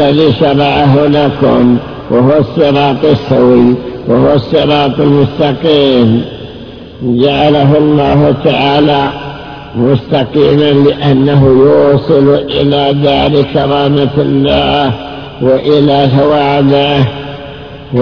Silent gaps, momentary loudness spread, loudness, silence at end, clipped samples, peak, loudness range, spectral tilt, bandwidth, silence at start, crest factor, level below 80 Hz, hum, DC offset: none; 10 LU; -9 LUFS; 0 s; 1%; 0 dBFS; 2 LU; -9 dB/octave; 5.4 kHz; 0 s; 8 dB; -34 dBFS; none; under 0.1%